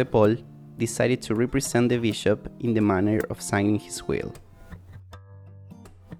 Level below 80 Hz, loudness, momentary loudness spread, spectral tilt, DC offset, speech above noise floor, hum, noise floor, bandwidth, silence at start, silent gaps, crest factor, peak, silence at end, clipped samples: -50 dBFS; -25 LUFS; 18 LU; -5.5 dB/octave; under 0.1%; 22 dB; none; -46 dBFS; 19 kHz; 0 s; none; 18 dB; -8 dBFS; 0 s; under 0.1%